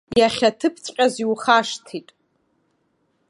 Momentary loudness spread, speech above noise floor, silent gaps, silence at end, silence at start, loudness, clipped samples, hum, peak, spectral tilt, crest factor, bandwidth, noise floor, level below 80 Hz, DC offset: 14 LU; 48 dB; none; 1.3 s; 0.1 s; -20 LUFS; under 0.1%; none; -2 dBFS; -3.5 dB/octave; 20 dB; 11.5 kHz; -68 dBFS; -58 dBFS; under 0.1%